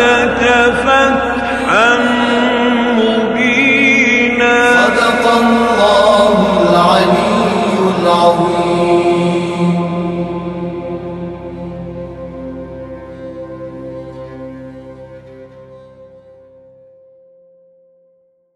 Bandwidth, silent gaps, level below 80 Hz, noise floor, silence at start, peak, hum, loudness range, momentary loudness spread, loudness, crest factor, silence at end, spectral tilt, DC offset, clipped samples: 12 kHz; none; -40 dBFS; -55 dBFS; 0 s; 0 dBFS; none; 20 LU; 19 LU; -11 LUFS; 14 dB; 2.5 s; -5 dB/octave; under 0.1%; under 0.1%